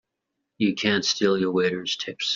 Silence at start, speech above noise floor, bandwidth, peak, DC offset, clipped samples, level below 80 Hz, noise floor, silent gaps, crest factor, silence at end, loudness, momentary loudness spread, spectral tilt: 0.6 s; 57 dB; 7.6 kHz; -6 dBFS; under 0.1%; under 0.1%; -66 dBFS; -81 dBFS; none; 20 dB; 0 s; -23 LUFS; 5 LU; -3 dB/octave